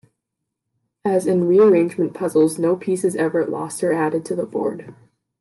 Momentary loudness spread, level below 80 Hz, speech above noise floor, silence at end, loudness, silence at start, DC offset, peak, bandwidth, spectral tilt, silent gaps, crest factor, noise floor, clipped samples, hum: 11 LU; -70 dBFS; 62 dB; 0.5 s; -19 LUFS; 1.05 s; under 0.1%; -4 dBFS; 12.5 kHz; -6.5 dB/octave; none; 14 dB; -80 dBFS; under 0.1%; none